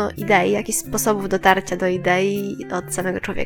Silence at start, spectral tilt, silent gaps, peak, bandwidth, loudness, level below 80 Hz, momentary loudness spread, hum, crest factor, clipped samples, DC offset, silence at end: 0 s; -4 dB/octave; none; 0 dBFS; 19.5 kHz; -20 LUFS; -42 dBFS; 8 LU; none; 20 dB; under 0.1%; under 0.1%; 0 s